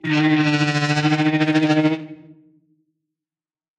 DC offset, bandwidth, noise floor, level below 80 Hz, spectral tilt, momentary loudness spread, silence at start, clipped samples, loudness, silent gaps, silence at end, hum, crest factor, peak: under 0.1%; 9.2 kHz; under -90 dBFS; -64 dBFS; -6 dB/octave; 5 LU; 0.05 s; under 0.1%; -18 LUFS; none; 1.65 s; none; 14 dB; -6 dBFS